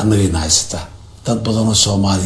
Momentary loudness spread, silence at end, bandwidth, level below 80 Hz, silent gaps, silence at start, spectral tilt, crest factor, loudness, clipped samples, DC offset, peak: 14 LU; 0 s; 11 kHz; -32 dBFS; none; 0 s; -4 dB/octave; 16 dB; -14 LUFS; under 0.1%; under 0.1%; 0 dBFS